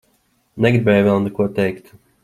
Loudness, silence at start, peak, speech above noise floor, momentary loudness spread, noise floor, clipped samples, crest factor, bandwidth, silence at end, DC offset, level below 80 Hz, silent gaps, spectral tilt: -17 LUFS; 0.55 s; -2 dBFS; 46 dB; 8 LU; -62 dBFS; under 0.1%; 16 dB; 13.5 kHz; 0.45 s; under 0.1%; -52 dBFS; none; -8 dB/octave